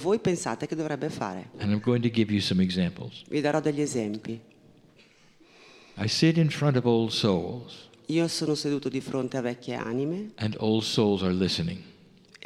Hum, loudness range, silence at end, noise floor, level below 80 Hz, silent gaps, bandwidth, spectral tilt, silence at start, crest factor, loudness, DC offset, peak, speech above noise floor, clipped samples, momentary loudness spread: none; 4 LU; 0.55 s; -58 dBFS; -62 dBFS; none; 14 kHz; -5.5 dB/octave; 0 s; 18 dB; -27 LUFS; under 0.1%; -8 dBFS; 31 dB; under 0.1%; 10 LU